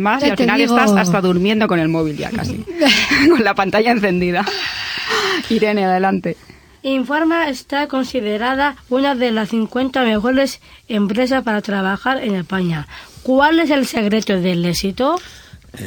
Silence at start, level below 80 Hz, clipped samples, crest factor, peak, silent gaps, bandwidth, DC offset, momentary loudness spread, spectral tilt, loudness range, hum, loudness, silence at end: 0 s; -46 dBFS; under 0.1%; 16 dB; 0 dBFS; none; over 20 kHz; under 0.1%; 9 LU; -5 dB/octave; 4 LU; none; -16 LUFS; 0 s